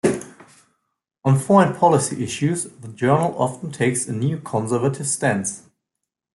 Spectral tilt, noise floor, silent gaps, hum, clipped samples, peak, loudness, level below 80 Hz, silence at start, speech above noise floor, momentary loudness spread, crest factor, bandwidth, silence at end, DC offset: -5.5 dB/octave; -82 dBFS; none; none; under 0.1%; -2 dBFS; -20 LUFS; -60 dBFS; 0.05 s; 62 dB; 11 LU; 18 dB; 12 kHz; 0.75 s; under 0.1%